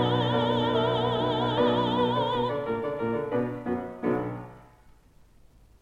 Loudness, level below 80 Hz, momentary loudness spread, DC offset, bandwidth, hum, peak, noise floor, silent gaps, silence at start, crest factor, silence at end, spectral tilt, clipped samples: -27 LUFS; -54 dBFS; 7 LU; under 0.1%; 8.4 kHz; none; -12 dBFS; -56 dBFS; none; 0 s; 16 dB; 1.2 s; -7.5 dB/octave; under 0.1%